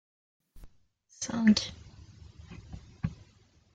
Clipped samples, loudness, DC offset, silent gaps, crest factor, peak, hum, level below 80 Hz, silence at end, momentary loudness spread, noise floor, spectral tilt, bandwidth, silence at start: under 0.1%; -30 LUFS; under 0.1%; none; 22 dB; -12 dBFS; none; -54 dBFS; 0.6 s; 28 LU; -64 dBFS; -4.5 dB/octave; 9 kHz; 0.55 s